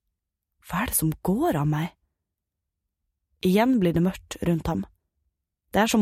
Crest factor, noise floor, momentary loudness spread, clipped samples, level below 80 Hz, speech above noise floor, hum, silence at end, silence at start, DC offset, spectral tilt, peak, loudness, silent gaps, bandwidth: 18 dB; -84 dBFS; 10 LU; under 0.1%; -48 dBFS; 61 dB; none; 0 s; 0.65 s; under 0.1%; -5.5 dB/octave; -8 dBFS; -25 LUFS; none; 16 kHz